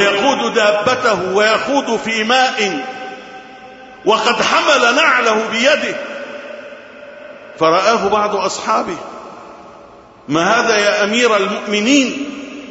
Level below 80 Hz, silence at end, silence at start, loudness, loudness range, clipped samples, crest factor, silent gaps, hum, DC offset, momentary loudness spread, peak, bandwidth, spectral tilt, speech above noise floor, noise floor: -56 dBFS; 0 s; 0 s; -14 LUFS; 4 LU; under 0.1%; 16 dB; none; none; under 0.1%; 21 LU; 0 dBFS; 8 kHz; -2.5 dB/octave; 26 dB; -40 dBFS